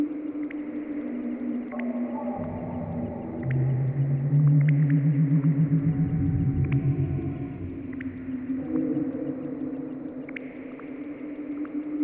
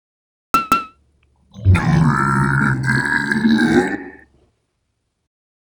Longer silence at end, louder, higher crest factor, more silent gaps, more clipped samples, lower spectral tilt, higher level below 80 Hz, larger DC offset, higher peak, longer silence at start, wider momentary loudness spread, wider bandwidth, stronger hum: second, 0 s vs 1.6 s; second, -27 LUFS vs -16 LUFS; about the same, 14 dB vs 18 dB; neither; neither; first, -13.5 dB/octave vs -6.5 dB/octave; second, -46 dBFS vs -38 dBFS; neither; second, -12 dBFS vs 0 dBFS; second, 0 s vs 0.55 s; first, 14 LU vs 8 LU; second, 3.2 kHz vs over 20 kHz; neither